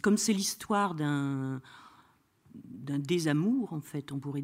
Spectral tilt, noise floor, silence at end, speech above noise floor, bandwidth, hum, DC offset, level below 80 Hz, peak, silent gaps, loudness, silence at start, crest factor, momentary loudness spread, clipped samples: -5 dB/octave; -65 dBFS; 0 s; 34 dB; 16 kHz; none; under 0.1%; -70 dBFS; -14 dBFS; none; -31 LUFS; 0.05 s; 18 dB; 11 LU; under 0.1%